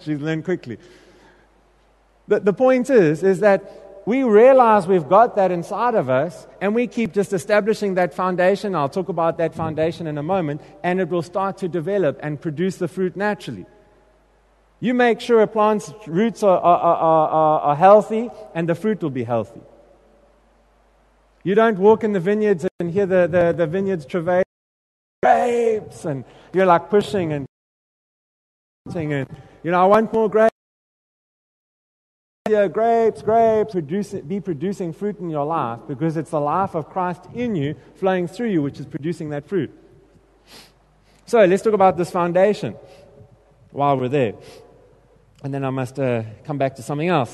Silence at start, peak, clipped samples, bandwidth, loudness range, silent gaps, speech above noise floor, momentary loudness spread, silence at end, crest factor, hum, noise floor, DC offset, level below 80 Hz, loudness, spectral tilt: 0.05 s; -2 dBFS; under 0.1%; 12 kHz; 8 LU; 22.71-22.79 s, 24.46-25.22 s, 27.49-28.85 s, 30.52-32.45 s; 38 dB; 12 LU; 0 s; 18 dB; none; -57 dBFS; under 0.1%; -58 dBFS; -19 LUFS; -7 dB/octave